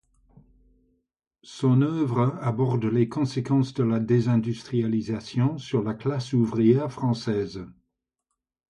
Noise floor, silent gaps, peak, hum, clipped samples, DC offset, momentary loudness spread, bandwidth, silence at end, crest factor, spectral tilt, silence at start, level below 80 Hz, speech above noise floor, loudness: -83 dBFS; none; -8 dBFS; none; under 0.1%; under 0.1%; 7 LU; 10 kHz; 1 s; 18 dB; -8 dB/octave; 1.45 s; -60 dBFS; 59 dB; -25 LUFS